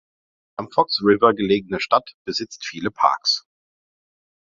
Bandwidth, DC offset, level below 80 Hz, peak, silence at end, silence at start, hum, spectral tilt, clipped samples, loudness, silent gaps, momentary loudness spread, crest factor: 7.6 kHz; under 0.1%; -58 dBFS; 0 dBFS; 1.1 s; 0.6 s; none; -4 dB/octave; under 0.1%; -20 LUFS; 2.14-2.25 s; 11 LU; 22 dB